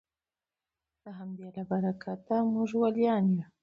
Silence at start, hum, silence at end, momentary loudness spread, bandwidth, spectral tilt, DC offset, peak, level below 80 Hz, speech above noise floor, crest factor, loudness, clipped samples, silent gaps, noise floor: 1.05 s; none; 0.2 s; 16 LU; 7 kHz; -9 dB/octave; under 0.1%; -14 dBFS; -74 dBFS; over 60 dB; 16 dB; -29 LUFS; under 0.1%; none; under -90 dBFS